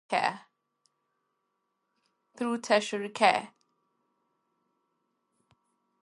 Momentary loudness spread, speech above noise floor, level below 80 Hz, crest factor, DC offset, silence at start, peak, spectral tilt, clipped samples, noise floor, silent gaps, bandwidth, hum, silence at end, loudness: 10 LU; 52 dB; -86 dBFS; 26 dB; under 0.1%; 0.1 s; -8 dBFS; -3 dB/octave; under 0.1%; -80 dBFS; none; 11.5 kHz; none; 2.55 s; -28 LUFS